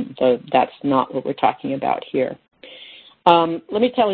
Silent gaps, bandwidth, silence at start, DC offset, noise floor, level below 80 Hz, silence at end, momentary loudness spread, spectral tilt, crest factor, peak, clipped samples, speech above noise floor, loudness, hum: none; 4.6 kHz; 0 s; under 0.1%; -44 dBFS; -62 dBFS; 0 s; 23 LU; -8 dB/octave; 20 dB; 0 dBFS; under 0.1%; 25 dB; -20 LUFS; none